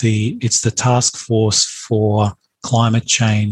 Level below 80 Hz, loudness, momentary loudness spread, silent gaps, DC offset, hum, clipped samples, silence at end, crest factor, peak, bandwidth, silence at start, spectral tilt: -52 dBFS; -16 LUFS; 4 LU; none; under 0.1%; none; under 0.1%; 0 s; 14 dB; -2 dBFS; 11.5 kHz; 0 s; -4 dB/octave